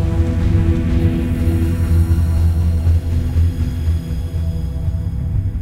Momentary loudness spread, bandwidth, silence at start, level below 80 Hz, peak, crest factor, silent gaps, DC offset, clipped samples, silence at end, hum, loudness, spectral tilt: 6 LU; 12 kHz; 0 s; -20 dBFS; -4 dBFS; 12 dB; none; under 0.1%; under 0.1%; 0 s; none; -18 LUFS; -8.5 dB/octave